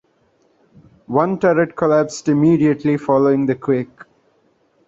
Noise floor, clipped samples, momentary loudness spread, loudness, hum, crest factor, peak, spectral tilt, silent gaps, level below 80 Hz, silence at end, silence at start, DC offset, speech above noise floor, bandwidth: -60 dBFS; under 0.1%; 6 LU; -17 LUFS; none; 16 dB; -2 dBFS; -7.5 dB/octave; none; -58 dBFS; 0.85 s; 1.1 s; under 0.1%; 44 dB; 7.8 kHz